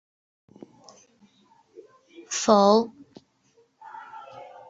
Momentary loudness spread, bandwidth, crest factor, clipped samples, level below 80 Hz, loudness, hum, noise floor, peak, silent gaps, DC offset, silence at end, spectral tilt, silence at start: 26 LU; 8 kHz; 24 dB; under 0.1%; -72 dBFS; -21 LUFS; none; -64 dBFS; -4 dBFS; none; under 0.1%; 0.25 s; -4.5 dB/octave; 2.3 s